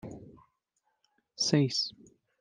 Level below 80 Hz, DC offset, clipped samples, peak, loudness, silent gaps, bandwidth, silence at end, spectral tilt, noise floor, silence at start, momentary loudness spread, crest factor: -70 dBFS; under 0.1%; under 0.1%; -12 dBFS; -29 LUFS; none; 11 kHz; 0.5 s; -4.5 dB/octave; -79 dBFS; 0.05 s; 21 LU; 24 dB